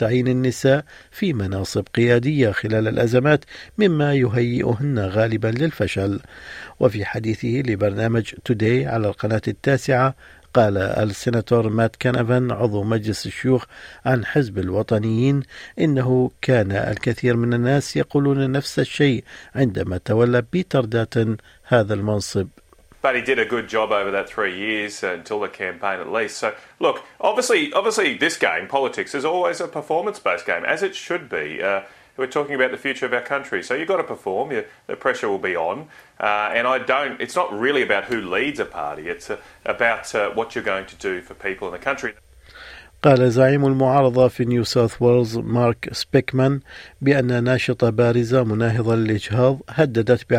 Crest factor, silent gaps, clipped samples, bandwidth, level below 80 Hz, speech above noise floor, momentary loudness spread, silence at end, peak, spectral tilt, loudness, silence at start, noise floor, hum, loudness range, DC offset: 18 dB; none; under 0.1%; 14.5 kHz; -52 dBFS; 22 dB; 9 LU; 0 s; -2 dBFS; -6.5 dB/octave; -21 LUFS; 0 s; -43 dBFS; none; 5 LU; under 0.1%